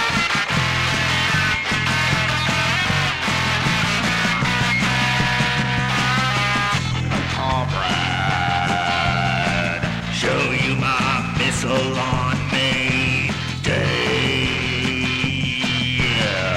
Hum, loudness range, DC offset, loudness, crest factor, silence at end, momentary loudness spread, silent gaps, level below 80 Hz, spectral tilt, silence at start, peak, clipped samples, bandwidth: none; 2 LU; under 0.1%; -19 LUFS; 14 dB; 0 s; 3 LU; none; -38 dBFS; -4 dB/octave; 0 s; -6 dBFS; under 0.1%; 15 kHz